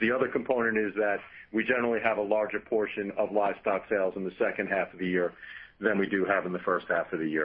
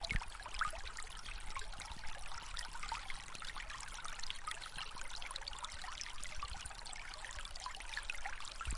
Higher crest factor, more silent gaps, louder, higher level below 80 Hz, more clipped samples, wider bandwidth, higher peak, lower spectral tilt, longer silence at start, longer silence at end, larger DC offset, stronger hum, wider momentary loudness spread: about the same, 18 dB vs 22 dB; neither; first, -29 LUFS vs -46 LUFS; second, -66 dBFS vs -50 dBFS; neither; second, 5.2 kHz vs 11.5 kHz; first, -10 dBFS vs -22 dBFS; first, -10 dB/octave vs -1.5 dB/octave; about the same, 0 s vs 0 s; about the same, 0 s vs 0 s; neither; neither; about the same, 5 LU vs 6 LU